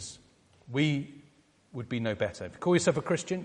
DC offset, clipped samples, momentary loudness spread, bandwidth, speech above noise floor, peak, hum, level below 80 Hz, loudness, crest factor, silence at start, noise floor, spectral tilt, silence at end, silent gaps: under 0.1%; under 0.1%; 17 LU; 11 kHz; 33 dB; -12 dBFS; none; -64 dBFS; -30 LUFS; 20 dB; 0 s; -63 dBFS; -5.5 dB/octave; 0 s; none